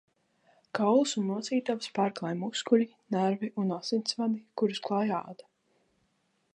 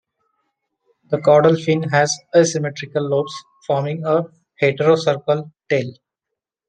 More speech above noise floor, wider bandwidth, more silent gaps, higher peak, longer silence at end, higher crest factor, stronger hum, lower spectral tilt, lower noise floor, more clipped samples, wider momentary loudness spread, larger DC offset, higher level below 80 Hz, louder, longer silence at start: second, 45 dB vs 66 dB; about the same, 10 kHz vs 9.4 kHz; neither; second, -10 dBFS vs -2 dBFS; first, 1.2 s vs 0.75 s; about the same, 20 dB vs 18 dB; neither; about the same, -5 dB/octave vs -5 dB/octave; second, -74 dBFS vs -83 dBFS; neither; second, 7 LU vs 10 LU; neither; second, -84 dBFS vs -64 dBFS; second, -30 LUFS vs -18 LUFS; second, 0.75 s vs 1.1 s